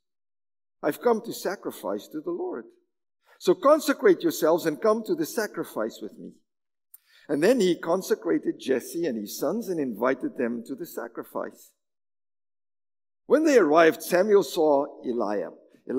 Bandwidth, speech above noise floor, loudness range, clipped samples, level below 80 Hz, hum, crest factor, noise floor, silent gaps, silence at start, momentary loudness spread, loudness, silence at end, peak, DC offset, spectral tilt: 16 kHz; over 65 dB; 8 LU; under 0.1%; -82 dBFS; none; 20 dB; under -90 dBFS; none; 0.8 s; 14 LU; -25 LUFS; 0 s; -6 dBFS; under 0.1%; -4.5 dB/octave